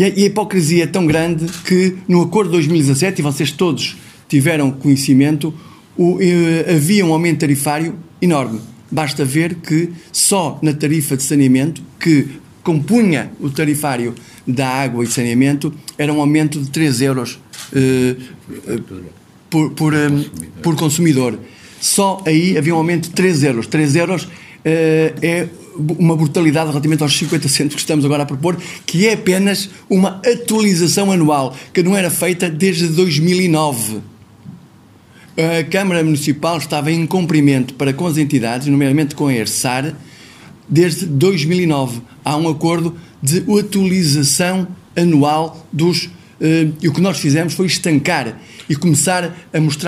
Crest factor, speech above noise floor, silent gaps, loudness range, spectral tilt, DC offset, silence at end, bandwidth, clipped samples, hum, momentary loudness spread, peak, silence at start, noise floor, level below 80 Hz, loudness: 16 dB; 30 dB; none; 3 LU; -5 dB/octave; under 0.1%; 0 s; 16 kHz; under 0.1%; none; 9 LU; 0 dBFS; 0 s; -44 dBFS; -54 dBFS; -15 LUFS